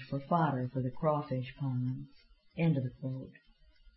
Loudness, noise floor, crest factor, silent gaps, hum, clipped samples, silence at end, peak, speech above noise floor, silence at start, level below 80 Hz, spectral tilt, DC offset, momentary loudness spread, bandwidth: -34 LUFS; -61 dBFS; 18 dB; none; none; under 0.1%; 0.05 s; -18 dBFS; 28 dB; 0 s; -62 dBFS; -8 dB/octave; under 0.1%; 14 LU; 5.6 kHz